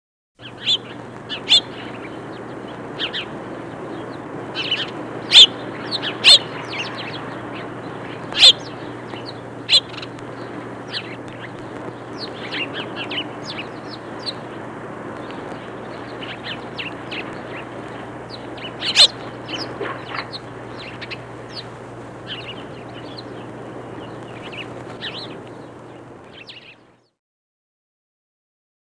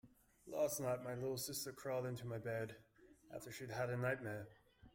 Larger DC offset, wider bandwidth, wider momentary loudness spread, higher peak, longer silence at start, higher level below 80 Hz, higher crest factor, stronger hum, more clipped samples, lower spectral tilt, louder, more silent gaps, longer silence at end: neither; second, 10.5 kHz vs 16.5 kHz; first, 23 LU vs 13 LU; first, 0 dBFS vs -28 dBFS; first, 0.4 s vs 0.05 s; first, -58 dBFS vs -74 dBFS; first, 24 dB vs 18 dB; neither; neither; second, -2 dB/octave vs -4.5 dB/octave; first, -17 LUFS vs -44 LUFS; neither; first, 2.2 s vs 0.05 s